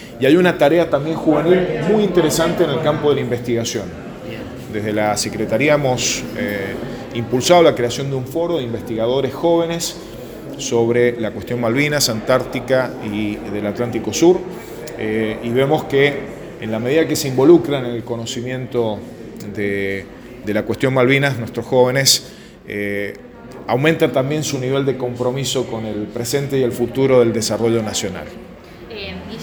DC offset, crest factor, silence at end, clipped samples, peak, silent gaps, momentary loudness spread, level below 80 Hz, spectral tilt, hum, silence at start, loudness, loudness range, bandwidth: under 0.1%; 18 dB; 0 s; under 0.1%; 0 dBFS; none; 16 LU; -46 dBFS; -4.5 dB/octave; none; 0 s; -17 LUFS; 3 LU; over 20 kHz